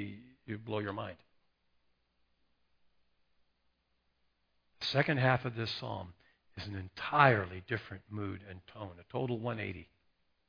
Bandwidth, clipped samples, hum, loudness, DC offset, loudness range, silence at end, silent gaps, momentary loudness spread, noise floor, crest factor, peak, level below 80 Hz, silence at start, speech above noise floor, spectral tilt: 5.4 kHz; under 0.1%; none; -34 LUFS; under 0.1%; 13 LU; 0.65 s; none; 21 LU; -78 dBFS; 28 dB; -8 dBFS; -68 dBFS; 0 s; 43 dB; -4 dB/octave